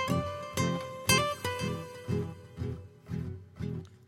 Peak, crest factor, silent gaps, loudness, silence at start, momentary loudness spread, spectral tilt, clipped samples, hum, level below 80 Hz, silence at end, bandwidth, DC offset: -10 dBFS; 24 dB; none; -33 LUFS; 0 s; 14 LU; -4 dB/octave; under 0.1%; none; -54 dBFS; 0 s; 16 kHz; under 0.1%